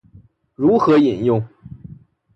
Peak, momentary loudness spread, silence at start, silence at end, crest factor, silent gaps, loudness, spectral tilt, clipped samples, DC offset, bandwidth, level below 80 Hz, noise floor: -4 dBFS; 19 LU; 0.6 s; 0.6 s; 16 dB; none; -16 LUFS; -8.5 dB/octave; under 0.1%; under 0.1%; 6.4 kHz; -52 dBFS; -49 dBFS